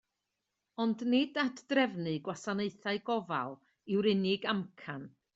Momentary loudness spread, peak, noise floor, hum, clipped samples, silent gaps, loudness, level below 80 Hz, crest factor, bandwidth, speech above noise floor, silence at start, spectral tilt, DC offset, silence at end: 14 LU; -16 dBFS; -86 dBFS; none; under 0.1%; none; -33 LUFS; -76 dBFS; 18 dB; 8 kHz; 53 dB; 0.8 s; -6 dB/octave; under 0.1%; 0.25 s